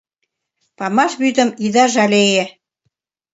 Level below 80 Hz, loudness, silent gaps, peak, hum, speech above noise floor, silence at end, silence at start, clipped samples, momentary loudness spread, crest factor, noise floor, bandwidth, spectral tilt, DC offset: -66 dBFS; -15 LUFS; none; 0 dBFS; none; 60 dB; 0.85 s; 0.8 s; under 0.1%; 7 LU; 18 dB; -74 dBFS; 8 kHz; -3.5 dB/octave; under 0.1%